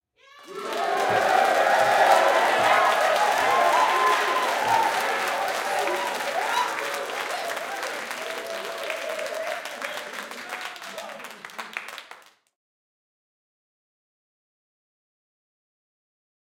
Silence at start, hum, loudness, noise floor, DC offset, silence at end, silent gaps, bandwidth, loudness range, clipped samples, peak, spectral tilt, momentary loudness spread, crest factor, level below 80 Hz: 0.35 s; none; -23 LUFS; -50 dBFS; under 0.1%; 4.35 s; none; 17 kHz; 18 LU; under 0.1%; -4 dBFS; -1.5 dB/octave; 16 LU; 22 dB; -72 dBFS